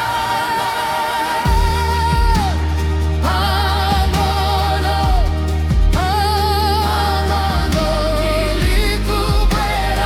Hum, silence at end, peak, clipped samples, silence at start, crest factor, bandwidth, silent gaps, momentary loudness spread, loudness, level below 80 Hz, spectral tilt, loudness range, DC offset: none; 0 s; -4 dBFS; under 0.1%; 0 s; 12 dB; 16.5 kHz; none; 3 LU; -17 LUFS; -20 dBFS; -5 dB/octave; 1 LU; under 0.1%